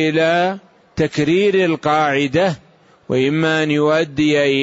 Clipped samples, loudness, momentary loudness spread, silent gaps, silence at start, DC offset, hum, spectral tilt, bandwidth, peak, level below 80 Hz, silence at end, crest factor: under 0.1%; -16 LUFS; 7 LU; none; 0 s; under 0.1%; none; -6 dB/octave; 8 kHz; -4 dBFS; -50 dBFS; 0 s; 12 dB